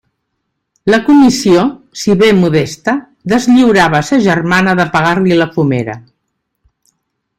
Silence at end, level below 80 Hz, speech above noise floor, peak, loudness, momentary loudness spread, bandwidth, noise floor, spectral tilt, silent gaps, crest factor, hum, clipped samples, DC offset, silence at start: 1.4 s; -46 dBFS; 60 dB; 0 dBFS; -11 LUFS; 10 LU; 15 kHz; -70 dBFS; -5.5 dB/octave; none; 12 dB; none; under 0.1%; under 0.1%; 0.85 s